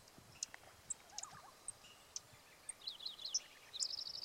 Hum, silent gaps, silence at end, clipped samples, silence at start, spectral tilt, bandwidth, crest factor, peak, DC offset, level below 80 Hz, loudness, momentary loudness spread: none; none; 0 s; under 0.1%; 0 s; 1 dB/octave; 16 kHz; 26 dB; -24 dBFS; under 0.1%; -80 dBFS; -46 LUFS; 13 LU